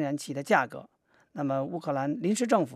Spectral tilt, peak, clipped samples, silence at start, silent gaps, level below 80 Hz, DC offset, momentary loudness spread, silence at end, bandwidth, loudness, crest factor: -5.5 dB/octave; -8 dBFS; under 0.1%; 0 s; none; -82 dBFS; under 0.1%; 10 LU; 0 s; 14.5 kHz; -29 LUFS; 22 dB